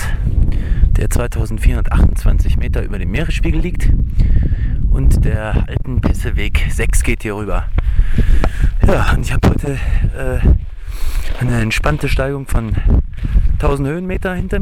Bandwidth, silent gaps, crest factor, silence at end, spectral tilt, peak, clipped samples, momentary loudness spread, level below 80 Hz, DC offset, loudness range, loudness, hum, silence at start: 14 kHz; none; 12 dB; 0 s; -6.5 dB/octave; 0 dBFS; under 0.1%; 5 LU; -14 dBFS; under 0.1%; 1 LU; -17 LUFS; none; 0 s